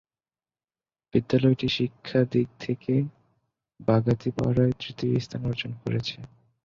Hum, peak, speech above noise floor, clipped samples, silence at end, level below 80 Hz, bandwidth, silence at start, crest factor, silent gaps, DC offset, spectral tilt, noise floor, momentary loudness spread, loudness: none; -8 dBFS; over 65 dB; under 0.1%; 0.4 s; -54 dBFS; 7.2 kHz; 1.15 s; 20 dB; none; under 0.1%; -8 dB/octave; under -90 dBFS; 9 LU; -26 LUFS